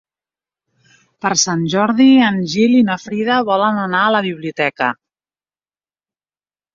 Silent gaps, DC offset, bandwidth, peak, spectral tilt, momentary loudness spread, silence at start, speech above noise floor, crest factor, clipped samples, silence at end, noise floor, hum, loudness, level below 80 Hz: none; under 0.1%; 7.6 kHz; 0 dBFS; -4 dB/octave; 10 LU; 1.25 s; over 76 dB; 16 dB; under 0.1%; 1.8 s; under -90 dBFS; 50 Hz at -60 dBFS; -15 LUFS; -60 dBFS